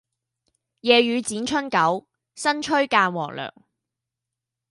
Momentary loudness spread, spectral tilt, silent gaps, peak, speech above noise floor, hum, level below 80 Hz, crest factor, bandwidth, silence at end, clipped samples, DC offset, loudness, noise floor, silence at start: 13 LU; -3.5 dB/octave; none; -2 dBFS; 64 dB; none; -66 dBFS; 22 dB; 11.5 kHz; 1.2 s; under 0.1%; under 0.1%; -21 LUFS; -86 dBFS; 0.85 s